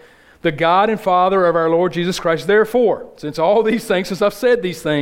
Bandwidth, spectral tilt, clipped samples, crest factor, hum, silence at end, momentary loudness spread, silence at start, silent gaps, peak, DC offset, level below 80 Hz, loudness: 16.5 kHz; -5.5 dB/octave; under 0.1%; 14 dB; none; 0 s; 6 LU; 0.45 s; none; -2 dBFS; under 0.1%; -50 dBFS; -16 LUFS